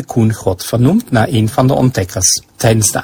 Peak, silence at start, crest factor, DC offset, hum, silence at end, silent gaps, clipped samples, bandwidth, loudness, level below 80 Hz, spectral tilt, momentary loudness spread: 0 dBFS; 0 s; 12 dB; under 0.1%; none; 0 s; none; under 0.1%; 16 kHz; -13 LUFS; -36 dBFS; -4.5 dB/octave; 3 LU